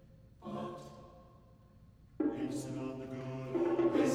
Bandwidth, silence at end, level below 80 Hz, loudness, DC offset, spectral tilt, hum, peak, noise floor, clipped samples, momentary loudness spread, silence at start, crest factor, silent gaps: 13.5 kHz; 0 s; -64 dBFS; -37 LUFS; under 0.1%; -6.5 dB/octave; none; -20 dBFS; -60 dBFS; under 0.1%; 21 LU; 0.15 s; 18 dB; none